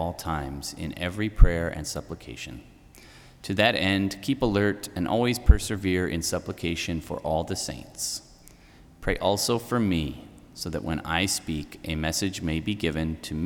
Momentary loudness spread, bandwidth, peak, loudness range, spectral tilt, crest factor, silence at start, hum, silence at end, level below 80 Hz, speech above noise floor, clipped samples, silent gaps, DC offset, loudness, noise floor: 12 LU; 18.5 kHz; -2 dBFS; 5 LU; -4.5 dB/octave; 24 dB; 0 s; none; 0 s; -32 dBFS; 26 dB; under 0.1%; none; under 0.1%; -27 LUFS; -52 dBFS